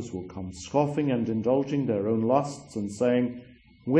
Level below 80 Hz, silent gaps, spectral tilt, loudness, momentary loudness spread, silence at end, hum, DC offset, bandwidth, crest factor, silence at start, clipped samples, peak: -60 dBFS; none; -7 dB/octave; -27 LUFS; 13 LU; 0 s; none; under 0.1%; 10 kHz; 18 dB; 0 s; under 0.1%; -8 dBFS